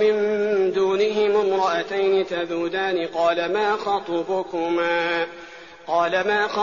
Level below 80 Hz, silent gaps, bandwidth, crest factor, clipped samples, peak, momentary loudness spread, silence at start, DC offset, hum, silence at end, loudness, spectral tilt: -64 dBFS; none; 7.2 kHz; 14 dB; under 0.1%; -8 dBFS; 6 LU; 0 s; 0.2%; none; 0 s; -22 LUFS; -2 dB/octave